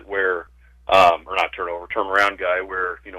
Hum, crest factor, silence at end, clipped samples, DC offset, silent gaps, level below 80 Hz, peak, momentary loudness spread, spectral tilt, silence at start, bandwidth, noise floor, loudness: none; 16 dB; 0 s; under 0.1%; under 0.1%; none; -50 dBFS; -4 dBFS; 12 LU; -3 dB/octave; 0.1 s; 15.5 kHz; -43 dBFS; -20 LUFS